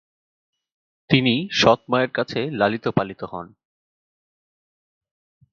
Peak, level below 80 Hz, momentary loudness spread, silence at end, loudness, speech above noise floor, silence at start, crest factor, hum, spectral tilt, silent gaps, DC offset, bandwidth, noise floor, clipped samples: 0 dBFS; -56 dBFS; 14 LU; 2.05 s; -20 LUFS; over 69 dB; 1.1 s; 24 dB; none; -5.5 dB/octave; none; under 0.1%; 7.4 kHz; under -90 dBFS; under 0.1%